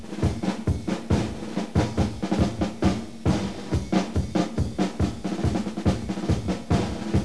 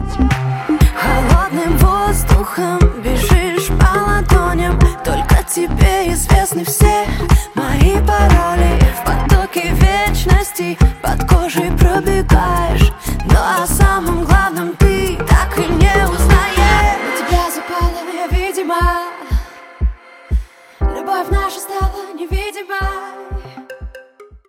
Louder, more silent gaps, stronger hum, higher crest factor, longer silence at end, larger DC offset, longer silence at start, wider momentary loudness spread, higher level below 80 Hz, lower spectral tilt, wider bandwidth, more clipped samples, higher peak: second, -26 LUFS vs -15 LUFS; neither; neither; about the same, 18 dB vs 14 dB; second, 0 s vs 0.15 s; first, 0.8% vs under 0.1%; about the same, 0 s vs 0 s; second, 3 LU vs 10 LU; second, -36 dBFS vs -16 dBFS; first, -7 dB/octave vs -5.5 dB/octave; second, 11 kHz vs 17 kHz; neither; second, -8 dBFS vs 0 dBFS